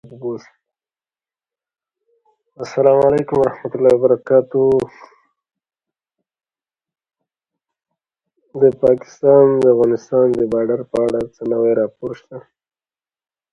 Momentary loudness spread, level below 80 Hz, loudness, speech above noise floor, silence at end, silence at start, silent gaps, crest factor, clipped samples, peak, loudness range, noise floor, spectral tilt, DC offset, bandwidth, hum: 16 LU; -56 dBFS; -15 LUFS; over 75 dB; 1.15 s; 0.05 s; none; 18 dB; under 0.1%; 0 dBFS; 7 LU; under -90 dBFS; -8.5 dB/octave; under 0.1%; 8.2 kHz; none